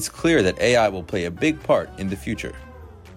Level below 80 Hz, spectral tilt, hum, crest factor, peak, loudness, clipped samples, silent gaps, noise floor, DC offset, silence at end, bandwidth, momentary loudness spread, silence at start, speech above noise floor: -44 dBFS; -5 dB/octave; none; 16 dB; -8 dBFS; -21 LUFS; under 0.1%; none; -42 dBFS; under 0.1%; 0 s; 16 kHz; 12 LU; 0 s; 20 dB